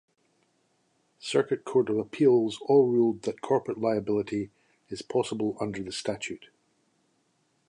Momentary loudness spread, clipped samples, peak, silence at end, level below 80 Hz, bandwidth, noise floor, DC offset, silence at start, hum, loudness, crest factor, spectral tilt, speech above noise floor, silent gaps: 14 LU; under 0.1%; -10 dBFS; 1.25 s; -66 dBFS; 11 kHz; -71 dBFS; under 0.1%; 1.25 s; none; -27 LUFS; 18 dB; -6 dB/octave; 45 dB; none